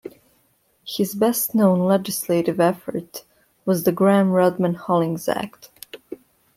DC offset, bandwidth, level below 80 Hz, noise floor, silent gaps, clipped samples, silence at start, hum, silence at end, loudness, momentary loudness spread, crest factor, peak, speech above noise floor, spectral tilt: under 0.1%; 16.5 kHz; -64 dBFS; -63 dBFS; none; under 0.1%; 0.05 s; none; 0.4 s; -20 LUFS; 22 LU; 16 dB; -6 dBFS; 44 dB; -6 dB/octave